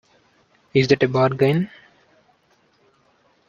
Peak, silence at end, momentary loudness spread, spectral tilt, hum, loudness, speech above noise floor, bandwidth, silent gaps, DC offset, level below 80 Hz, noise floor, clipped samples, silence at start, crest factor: -2 dBFS; 1.85 s; 7 LU; -7 dB/octave; none; -19 LUFS; 43 dB; 7.2 kHz; none; under 0.1%; -58 dBFS; -61 dBFS; under 0.1%; 0.75 s; 20 dB